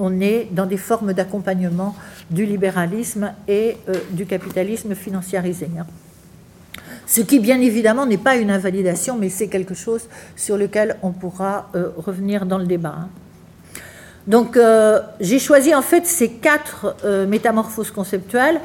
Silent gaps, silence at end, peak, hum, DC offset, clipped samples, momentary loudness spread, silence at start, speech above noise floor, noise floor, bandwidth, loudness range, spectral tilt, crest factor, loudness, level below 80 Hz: none; 0 s; -2 dBFS; none; under 0.1%; under 0.1%; 14 LU; 0 s; 27 dB; -45 dBFS; 17 kHz; 8 LU; -5 dB/octave; 18 dB; -18 LUFS; -56 dBFS